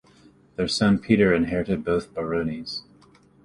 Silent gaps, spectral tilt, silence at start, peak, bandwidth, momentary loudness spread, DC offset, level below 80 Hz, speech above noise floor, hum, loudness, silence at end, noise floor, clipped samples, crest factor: none; -6 dB/octave; 0.6 s; -4 dBFS; 11.5 kHz; 14 LU; under 0.1%; -48 dBFS; 32 dB; none; -23 LUFS; 0.65 s; -55 dBFS; under 0.1%; 20 dB